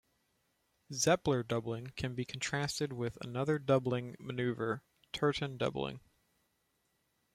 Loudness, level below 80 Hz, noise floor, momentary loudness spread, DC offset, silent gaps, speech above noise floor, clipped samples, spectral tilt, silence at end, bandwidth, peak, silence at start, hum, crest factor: -35 LUFS; -64 dBFS; -79 dBFS; 11 LU; under 0.1%; none; 44 dB; under 0.1%; -5 dB/octave; 1.35 s; 15.5 kHz; -16 dBFS; 0.9 s; none; 22 dB